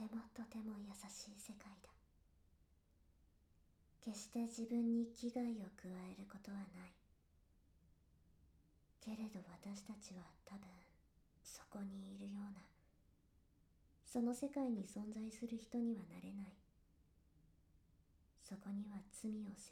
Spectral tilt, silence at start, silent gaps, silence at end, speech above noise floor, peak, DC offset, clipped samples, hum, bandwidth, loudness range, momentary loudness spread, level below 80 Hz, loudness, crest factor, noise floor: -5.5 dB/octave; 0 s; none; 0 s; 27 dB; -32 dBFS; under 0.1%; under 0.1%; none; 15 kHz; 11 LU; 16 LU; -76 dBFS; -48 LUFS; 18 dB; -75 dBFS